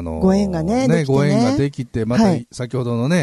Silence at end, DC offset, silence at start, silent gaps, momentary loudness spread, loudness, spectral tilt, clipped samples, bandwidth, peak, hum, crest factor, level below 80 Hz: 0 s; under 0.1%; 0 s; none; 8 LU; -18 LUFS; -7 dB/octave; under 0.1%; 12 kHz; -4 dBFS; none; 14 dB; -40 dBFS